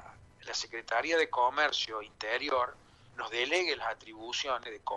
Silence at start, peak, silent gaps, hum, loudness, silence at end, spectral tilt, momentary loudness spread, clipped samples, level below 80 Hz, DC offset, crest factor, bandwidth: 0 s; -14 dBFS; none; none; -32 LUFS; 0 s; -1.5 dB/octave; 10 LU; under 0.1%; -66 dBFS; under 0.1%; 20 dB; 11 kHz